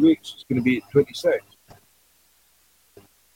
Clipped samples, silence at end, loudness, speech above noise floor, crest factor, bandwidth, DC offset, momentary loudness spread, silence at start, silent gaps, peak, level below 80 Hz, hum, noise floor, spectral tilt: under 0.1%; 1.95 s; -23 LUFS; 39 dB; 18 dB; 16.5 kHz; under 0.1%; 7 LU; 0 s; none; -6 dBFS; -60 dBFS; none; -61 dBFS; -6.5 dB/octave